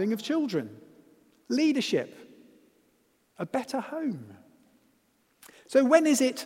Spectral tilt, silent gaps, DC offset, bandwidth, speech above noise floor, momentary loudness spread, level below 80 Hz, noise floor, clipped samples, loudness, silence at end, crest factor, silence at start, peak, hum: -4 dB/octave; none; under 0.1%; 16 kHz; 42 dB; 17 LU; -80 dBFS; -69 dBFS; under 0.1%; -27 LUFS; 0 s; 22 dB; 0 s; -6 dBFS; none